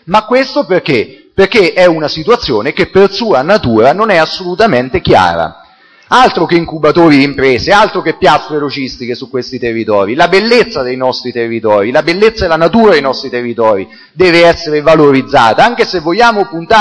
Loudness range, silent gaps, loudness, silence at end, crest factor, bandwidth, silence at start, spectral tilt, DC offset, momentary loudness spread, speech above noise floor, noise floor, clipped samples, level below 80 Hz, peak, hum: 3 LU; none; -9 LUFS; 0 s; 10 dB; 11 kHz; 0.05 s; -5.5 dB/octave; under 0.1%; 9 LU; 33 dB; -42 dBFS; 1%; -38 dBFS; 0 dBFS; none